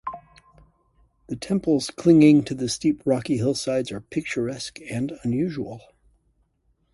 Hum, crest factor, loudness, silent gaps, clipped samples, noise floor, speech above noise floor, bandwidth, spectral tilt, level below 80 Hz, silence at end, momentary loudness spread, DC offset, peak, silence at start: none; 20 dB; -23 LUFS; none; under 0.1%; -68 dBFS; 46 dB; 11.5 kHz; -6 dB/octave; -56 dBFS; 1.15 s; 19 LU; under 0.1%; -4 dBFS; 0.05 s